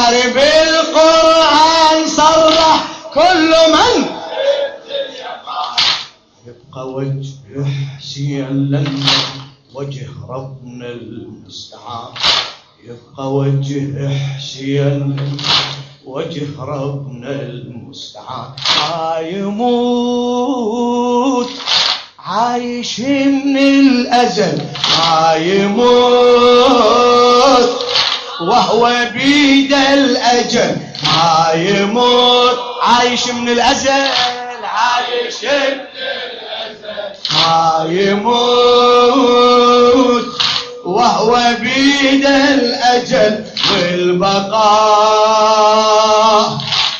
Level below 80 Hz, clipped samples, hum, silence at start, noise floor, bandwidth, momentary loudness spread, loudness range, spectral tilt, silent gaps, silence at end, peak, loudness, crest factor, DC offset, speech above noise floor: -48 dBFS; under 0.1%; none; 0 s; -40 dBFS; 8.4 kHz; 17 LU; 10 LU; -4 dB/octave; none; 0 s; 0 dBFS; -12 LUFS; 12 dB; under 0.1%; 28 dB